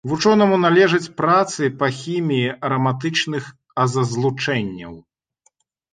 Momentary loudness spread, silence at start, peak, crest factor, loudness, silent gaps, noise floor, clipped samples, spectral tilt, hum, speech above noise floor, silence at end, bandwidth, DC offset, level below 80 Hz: 11 LU; 0.05 s; -2 dBFS; 16 dB; -19 LUFS; none; -64 dBFS; under 0.1%; -5.5 dB/octave; none; 46 dB; 0.95 s; 9.6 kHz; under 0.1%; -58 dBFS